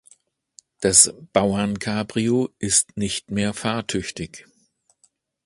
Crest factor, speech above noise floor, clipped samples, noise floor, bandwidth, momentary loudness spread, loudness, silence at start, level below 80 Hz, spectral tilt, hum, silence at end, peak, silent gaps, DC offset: 24 dB; 43 dB; under 0.1%; -64 dBFS; 11.5 kHz; 13 LU; -20 LUFS; 0.8 s; -50 dBFS; -3 dB/octave; none; 1.05 s; 0 dBFS; none; under 0.1%